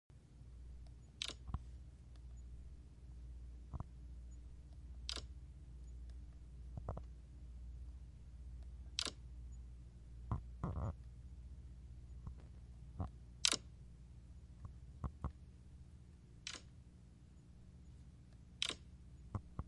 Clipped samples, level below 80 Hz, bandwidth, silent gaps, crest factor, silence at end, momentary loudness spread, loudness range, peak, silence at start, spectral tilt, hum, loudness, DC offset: under 0.1%; -54 dBFS; 11 kHz; none; 36 dB; 0 s; 18 LU; 10 LU; -14 dBFS; 0.1 s; -3 dB/octave; none; -49 LUFS; under 0.1%